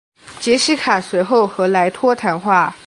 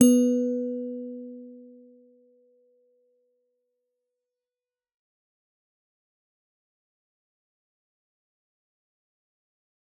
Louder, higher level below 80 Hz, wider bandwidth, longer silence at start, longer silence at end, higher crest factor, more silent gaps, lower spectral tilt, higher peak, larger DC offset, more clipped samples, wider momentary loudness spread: first, -16 LUFS vs -26 LUFS; first, -60 dBFS vs -84 dBFS; about the same, 11.5 kHz vs 11.5 kHz; first, 0.25 s vs 0 s; second, 0.1 s vs 8.35 s; second, 16 dB vs 26 dB; neither; about the same, -4 dB/octave vs -5 dB/octave; about the same, -2 dBFS vs -4 dBFS; neither; neither; second, 3 LU vs 25 LU